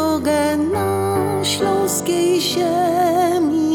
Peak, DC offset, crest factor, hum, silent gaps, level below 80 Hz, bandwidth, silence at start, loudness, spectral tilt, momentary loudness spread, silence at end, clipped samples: -6 dBFS; under 0.1%; 12 dB; none; none; -52 dBFS; 18.5 kHz; 0 s; -18 LUFS; -4.5 dB/octave; 3 LU; 0 s; under 0.1%